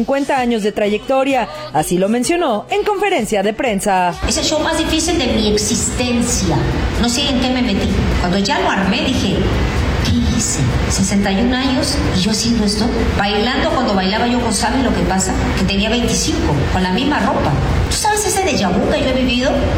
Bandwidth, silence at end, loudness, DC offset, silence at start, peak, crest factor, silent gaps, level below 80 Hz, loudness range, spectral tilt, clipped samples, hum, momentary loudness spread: 17.5 kHz; 0 s; -16 LUFS; under 0.1%; 0 s; -4 dBFS; 12 dB; none; -26 dBFS; 1 LU; -4.5 dB/octave; under 0.1%; none; 2 LU